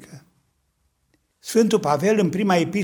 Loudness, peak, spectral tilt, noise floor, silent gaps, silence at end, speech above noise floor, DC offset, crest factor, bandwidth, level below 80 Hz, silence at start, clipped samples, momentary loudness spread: -20 LUFS; -4 dBFS; -5.5 dB/octave; -69 dBFS; none; 0 s; 50 dB; under 0.1%; 18 dB; over 20 kHz; -64 dBFS; 0 s; under 0.1%; 4 LU